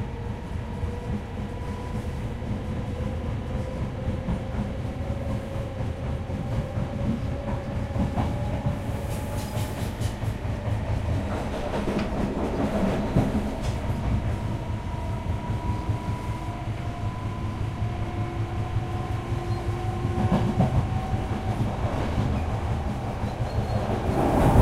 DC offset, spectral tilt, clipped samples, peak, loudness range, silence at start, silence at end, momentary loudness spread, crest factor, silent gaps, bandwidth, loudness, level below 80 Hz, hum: under 0.1%; -7.5 dB/octave; under 0.1%; -4 dBFS; 4 LU; 0 s; 0 s; 7 LU; 22 dB; none; 15 kHz; -29 LUFS; -34 dBFS; none